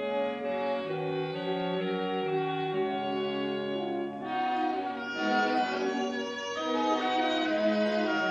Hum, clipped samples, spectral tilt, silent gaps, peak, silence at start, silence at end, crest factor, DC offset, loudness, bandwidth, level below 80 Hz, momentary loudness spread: none; under 0.1%; -5.5 dB/octave; none; -16 dBFS; 0 s; 0 s; 14 dB; under 0.1%; -30 LUFS; 8.4 kHz; -74 dBFS; 5 LU